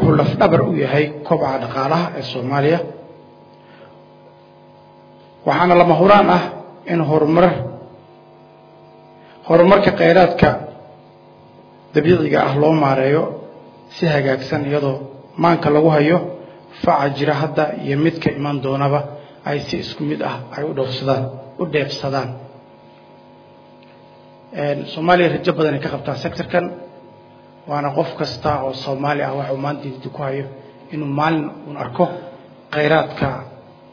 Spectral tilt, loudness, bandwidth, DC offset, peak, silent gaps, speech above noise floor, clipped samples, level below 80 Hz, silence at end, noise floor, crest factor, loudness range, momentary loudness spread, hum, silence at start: -8 dB/octave; -17 LUFS; 5.4 kHz; under 0.1%; 0 dBFS; none; 28 dB; under 0.1%; -48 dBFS; 0.3 s; -45 dBFS; 18 dB; 8 LU; 16 LU; none; 0 s